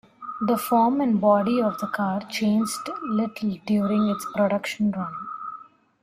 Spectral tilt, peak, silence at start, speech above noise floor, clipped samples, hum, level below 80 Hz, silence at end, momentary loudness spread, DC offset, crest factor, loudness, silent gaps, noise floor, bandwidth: -6 dB/octave; -8 dBFS; 0.2 s; 22 dB; under 0.1%; none; -64 dBFS; 0.4 s; 13 LU; under 0.1%; 16 dB; -24 LUFS; none; -45 dBFS; 16 kHz